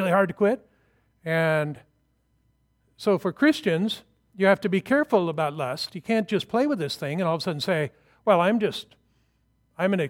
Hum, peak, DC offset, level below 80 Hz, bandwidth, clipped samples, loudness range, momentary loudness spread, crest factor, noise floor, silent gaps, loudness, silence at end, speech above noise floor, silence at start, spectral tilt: none; -4 dBFS; under 0.1%; -68 dBFS; 16.5 kHz; under 0.1%; 3 LU; 9 LU; 20 dB; -68 dBFS; none; -25 LUFS; 0 s; 45 dB; 0 s; -6 dB/octave